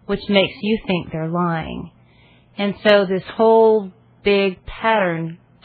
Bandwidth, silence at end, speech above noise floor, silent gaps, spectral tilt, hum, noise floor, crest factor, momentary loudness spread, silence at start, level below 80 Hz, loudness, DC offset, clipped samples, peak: 4.9 kHz; 0.3 s; 33 dB; none; -8.5 dB/octave; none; -51 dBFS; 18 dB; 14 LU; 0.1 s; -46 dBFS; -18 LUFS; under 0.1%; under 0.1%; 0 dBFS